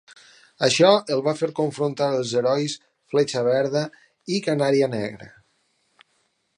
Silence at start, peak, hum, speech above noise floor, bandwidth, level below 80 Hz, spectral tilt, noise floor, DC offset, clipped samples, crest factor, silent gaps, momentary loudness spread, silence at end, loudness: 0.6 s; -2 dBFS; none; 48 dB; 11 kHz; -70 dBFS; -4.5 dB/octave; -69 dBFS; under 0.1%; under 0.1%; 20 dB; none; 13 LU; 1.3 s; -22 LUFS